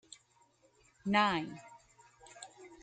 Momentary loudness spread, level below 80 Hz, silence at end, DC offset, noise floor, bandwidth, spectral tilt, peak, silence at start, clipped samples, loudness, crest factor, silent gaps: 27 LU; -72 dBFS; 0.1 s; under 0.1%; -69 dBFS; 9.2 kHz; -4.5 dB/octave; -16 dBFS; 1.05 s; under 0.1%; -33 LUFS; 22 dB; none